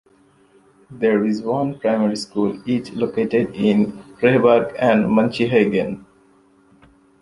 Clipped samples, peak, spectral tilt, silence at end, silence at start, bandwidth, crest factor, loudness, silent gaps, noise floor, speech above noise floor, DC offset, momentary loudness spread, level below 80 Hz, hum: under 0.1%; -2 dBFS; -7 dB/octave; 1.25 s; 0.9 s; 11.5 kHz; 18 dB; -19 LUFS; none; -55 dBFS; 37 dB; under 0.1%; 8 LU; -56 dBFS; none